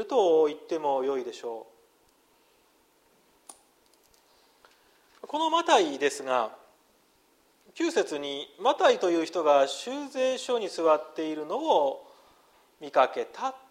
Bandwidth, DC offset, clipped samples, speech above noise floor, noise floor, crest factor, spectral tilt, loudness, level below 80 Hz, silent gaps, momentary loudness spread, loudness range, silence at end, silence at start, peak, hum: 15 kHz; under 0.1%; under 0.1%; 39 dB; -65 dBFS; 20 dB; -2.5 dB/octave; -27 LUFS; -80 dBFS; none; 12 LU; 9 LU; 0.1 s; 0 s; -8 dBFS; none